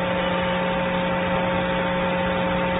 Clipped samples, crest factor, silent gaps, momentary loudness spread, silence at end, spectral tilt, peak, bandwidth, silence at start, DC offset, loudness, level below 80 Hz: under 0.1%; 12 dB; none; 1 LU; 0 s; -11 dB/octave; -10 dBFS; 4 kHz; 0 s; under 0.1%; -23 LUFS; -42 dBFS